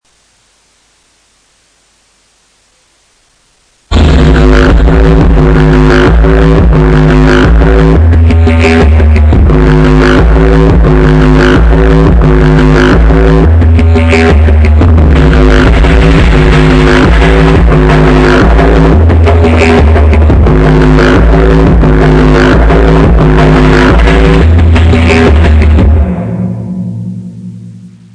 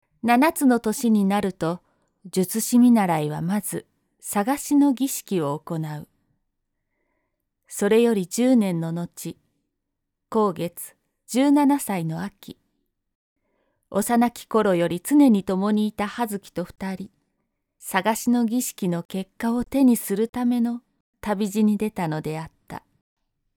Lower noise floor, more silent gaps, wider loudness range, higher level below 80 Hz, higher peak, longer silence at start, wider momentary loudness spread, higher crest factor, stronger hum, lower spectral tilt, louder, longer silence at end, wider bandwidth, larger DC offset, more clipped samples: second, -49 dBFS vs -80 dBFS; second, none vs 13.15-13.36 s, 19.05-19.09 s, 20.29-20.33 s, 21.00-21.13 s; about the same, 3 LU vs 4 LU; first, -8 dBFS vs -60 dBFS; first, 0 dBFS vs -6 dBFS; first, 3.9 s vs 0.25 s; second, 1 LU vs 16 LU; second, 4 dB vs 18 dB; neither; first, -7.5 dB/octave vs -5.5 dB/octave; first, -5 LUFS vs -22 LUFS; second, 0.25 s vs 0.8 s; second, 9.2 kHz vs 19.5 kHz; neither; first, 1% vs under 0.1%